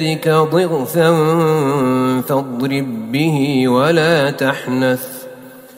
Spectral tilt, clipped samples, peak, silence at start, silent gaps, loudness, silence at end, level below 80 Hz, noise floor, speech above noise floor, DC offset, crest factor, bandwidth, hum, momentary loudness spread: -6 dB/octave; under 0.1%; 0 dBFS; 0 s; none; -15 LUFS; 0 s; -58 dBFS; -36 dBFS; 22 dB; under 0.1%; 14 dB; 16.5 kHz; none; 8 LU